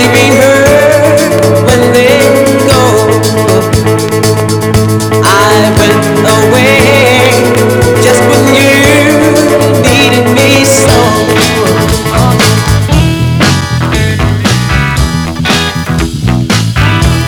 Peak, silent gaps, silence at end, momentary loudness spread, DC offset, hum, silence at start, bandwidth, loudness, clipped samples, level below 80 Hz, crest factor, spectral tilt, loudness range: 0 dBFS; none; 0 s; 5 LU; under 0.1%; none; 0 s; over 20 kHz; -6 LUFS; 3%; -22 dBFS; 6 dB; -5 dB/octave; 4 LU